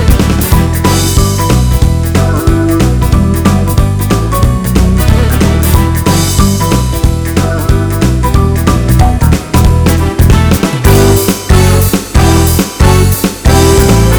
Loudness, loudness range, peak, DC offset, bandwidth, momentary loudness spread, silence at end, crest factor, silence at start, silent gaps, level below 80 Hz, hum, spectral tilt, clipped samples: -9 LUFS; 2 LU; 0 dBFS; under 0.1%; over 20 kHz; 4 LU; 0 s; 8 dB; 0 s; none; -12 dBFS; none; -5.5 dB/octave; 2%